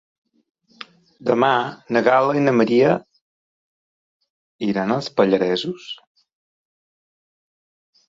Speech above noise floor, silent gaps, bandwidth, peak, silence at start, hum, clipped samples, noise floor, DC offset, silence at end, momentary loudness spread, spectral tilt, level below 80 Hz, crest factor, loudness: 25 dB; 3.21-4.20 s, 4.30-4.59 s; 7.8 kHz; -2 dBFS; 1.2 s; none; under 0.1%; -43 dBFS; under 0.1%; 2.15 s; 20 LU; -6.5 dB/octave; -66 dBFS; 20 dB; -19 LUFS